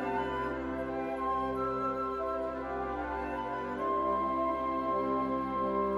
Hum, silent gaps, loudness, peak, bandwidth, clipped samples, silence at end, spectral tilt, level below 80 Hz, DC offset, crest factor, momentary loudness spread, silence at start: none; none; -33 LUFS; -20 dBFS; 12 kHz; under 0.1%; 0 s; -7.5 dB/octave; -52 dBFS; under 0.1%; 12 dB; 5 LU; 0 s